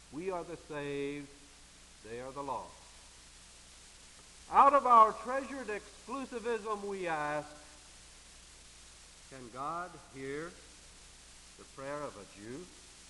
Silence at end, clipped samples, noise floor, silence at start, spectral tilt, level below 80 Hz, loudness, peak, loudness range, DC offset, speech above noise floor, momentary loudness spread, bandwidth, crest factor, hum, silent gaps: 0.05 s; under 0.1%; -57 dBFS; 0.1 s; -4 dB/octave; -62 dBFS; -32 LUFS; -10 dBFS; 16 LU; under 0.1%; 24 dB; 28 LU; 11.5 kHz; 24 dB; none; none